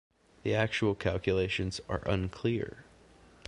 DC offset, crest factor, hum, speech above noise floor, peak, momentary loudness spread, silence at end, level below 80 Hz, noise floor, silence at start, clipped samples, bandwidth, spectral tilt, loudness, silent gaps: under 0.1%; 20 dB; none; 27 dB; -12 dBFS; 6 LU; 0.65 s; -48 dBFS; -58 dBFS; 0.45 s; under 0.1%; 11 kHz; -6 dB/octave; -32 LUFS; none